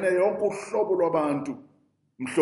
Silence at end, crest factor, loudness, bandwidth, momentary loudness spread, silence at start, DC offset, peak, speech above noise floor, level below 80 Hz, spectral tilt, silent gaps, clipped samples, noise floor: 0 s; 18 dB; -26 LUFS; 11.5 kHz; 13 LU; 0 s; under 0.1%; -8 dBFS; 35 dB; -72 dBFS; -6 dB/octave; none; under 0.1%; -60 dBFS